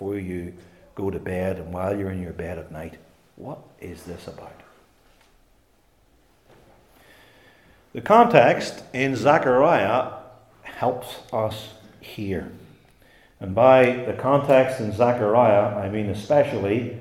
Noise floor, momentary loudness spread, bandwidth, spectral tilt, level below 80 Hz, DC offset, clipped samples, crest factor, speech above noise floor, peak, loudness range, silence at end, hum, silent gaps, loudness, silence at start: -61 dBFS; 23 LU; 15 kHz; -6.5 dB/octave; -58 dBFS; under 0.1%; under 0.1%; 22 dB; 40 dB; 0 dBFS; 19 LU; 0 s; none; none; -21 LUFS; 0 s